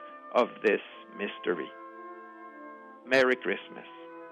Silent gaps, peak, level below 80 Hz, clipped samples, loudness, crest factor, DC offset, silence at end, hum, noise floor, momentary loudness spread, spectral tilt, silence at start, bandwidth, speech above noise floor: none; -12 dBFS; -76 dBFS; under 0.1%; -29 LUFS; 20 dB; under 0.1%; 0 s; none; -47 dBFS; 21 LU; -4.5 dB/octave; 0 s; 11.5 kHz; 18 dB